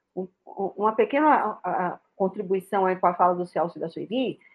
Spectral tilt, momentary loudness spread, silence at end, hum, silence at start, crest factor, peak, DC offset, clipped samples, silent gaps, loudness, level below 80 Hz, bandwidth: -7.5 dB/octave; 12 LU; 0.2 s; none; 0.15 s; 20 dB; -6 dBFS; under 0.1%; under 0.1%; none; -25 LUFS; -76 dBFS; 12.5 kHz